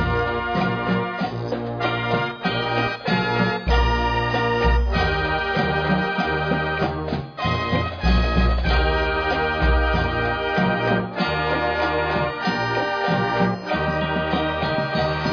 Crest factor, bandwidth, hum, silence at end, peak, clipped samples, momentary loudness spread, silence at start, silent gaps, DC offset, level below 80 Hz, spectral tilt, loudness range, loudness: 16 dB; 5.4 kHz; none; 0 s; -6 dBFS; under 0.1%; 4 LU; 0 s; none; under 0.1%; -28 dBFS; -7 dB/octave; 2 LU; -22 LUFS